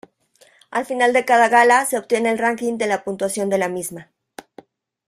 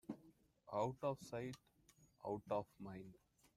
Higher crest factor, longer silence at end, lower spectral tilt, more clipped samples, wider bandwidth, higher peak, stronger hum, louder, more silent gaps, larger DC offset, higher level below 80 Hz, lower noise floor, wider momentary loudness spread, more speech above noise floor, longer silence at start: about the same, 18 dB vs 20 dB; first, 1.05 s vs 0.45 s; second, -3.5 dB/octave vs -6.5 dB/octave; neither; about the same, 15.5 kHz vs 15.5 kHz; first, -2 dBFS vs -28 dBFS; neither; first, -18 LUFS vs -47 LUFS; neither; neither; first, -66 dBFS vs -78 dBFS; second, -56 dBFS vs -73 dBFS; about the same, 13 LU vs 14 LU; first, 37 dB vs 26 dB; first, 0.7 s vs 0.1 s